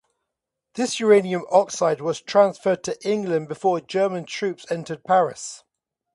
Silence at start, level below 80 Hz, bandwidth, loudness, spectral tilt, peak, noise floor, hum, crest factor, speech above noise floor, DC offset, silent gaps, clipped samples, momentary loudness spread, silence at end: 0.75 s; -70 dBFS; 11.5 kHz; -22 LUFS; -4.5 dB/octave; -4 dBFS; -83 dBFS; none; 20 dB; 62 dB; under 0.1%; none; under 0.1%; 11 LU; 0.55 s